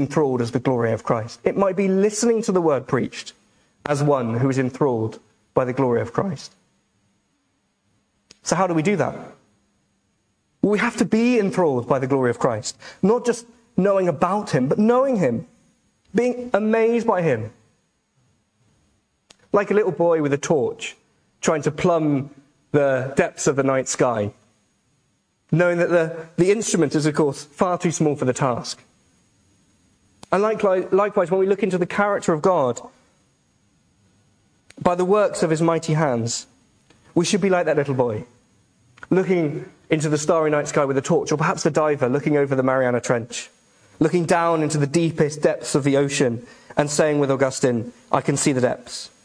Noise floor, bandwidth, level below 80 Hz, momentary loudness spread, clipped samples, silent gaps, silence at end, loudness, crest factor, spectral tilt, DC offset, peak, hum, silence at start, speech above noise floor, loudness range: -69 dBFS; 10.5 kHz; -58 dBFS; 8 LU; under 0.1%; none; 0.15 s; -21 LUFS; 22 dB; -5.5 dB/octave; under 0.1%; 0 dBFS; none; 0 s; 49 dB; 4 LU